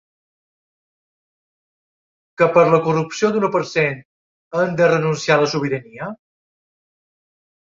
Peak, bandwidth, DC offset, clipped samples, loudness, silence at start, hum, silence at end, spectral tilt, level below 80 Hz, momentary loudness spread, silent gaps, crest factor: -2 dBFS; 7.6 kHz; under 0.1%; under 0.1%; -18 LUFS; 2.4 s; none; 1.5 s; -5.5 dB/octave; -62 dBFS; 14 LU; 4.05-4.51 s; 20 dB